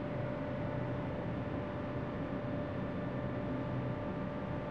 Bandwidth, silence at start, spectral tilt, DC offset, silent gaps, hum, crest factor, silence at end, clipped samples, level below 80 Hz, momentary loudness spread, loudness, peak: 6.4 kHz; 0 s; -9.5 dB/octave; 0.1%; none; none; 14 dB; 0 s; under 0.1%; -54 dBFS; 1 LU; -39 LUFS; -24 dBFS